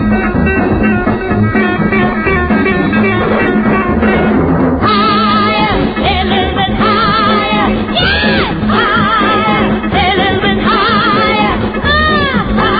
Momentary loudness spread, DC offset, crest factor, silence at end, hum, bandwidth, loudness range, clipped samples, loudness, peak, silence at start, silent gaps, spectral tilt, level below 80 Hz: 3 LU; under 0.1%; 10 dB; 0 s; none; 5 kHz; 1 LU; under 0.1%; -11 LUFS; 0 dBFS; 0 s; none; -3.5 dB/octave; -26 dBFS